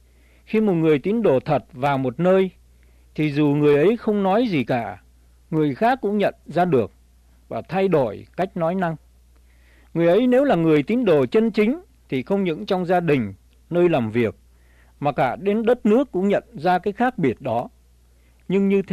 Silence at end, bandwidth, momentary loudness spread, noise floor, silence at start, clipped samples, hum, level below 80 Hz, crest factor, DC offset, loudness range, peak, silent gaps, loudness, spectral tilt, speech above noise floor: 0 s; 13.5 kHz; 9 LU; -54 dBFS; 0.5 s; under 0.1%; none; -52 dBFS; 14 dB; under 0.1%; 3 LU; -8 dBFS; none; -21 LUFS; -8.5 dB/octave; 35 dB